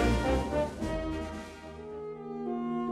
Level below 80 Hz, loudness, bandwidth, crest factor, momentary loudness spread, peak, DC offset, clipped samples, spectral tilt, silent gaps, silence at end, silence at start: -40 dBFS; -34 LUFS; 13.5 kHz; 18 dB; 14 LU; -16 dBFS; under 0.1%; under 0.1%; -6.5 dB/octave; none; 0 s; 0 s